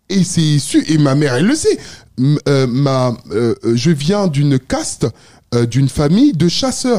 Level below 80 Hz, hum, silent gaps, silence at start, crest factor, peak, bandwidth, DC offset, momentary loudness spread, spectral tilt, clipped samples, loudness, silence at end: -42 dBFS; none; none; 0.1 s; 12 dB; -2 dBFS; 15 kHz; 1%; 7 LU; -6 dB/octave; under 0.1%; -14 LUFS; 0 s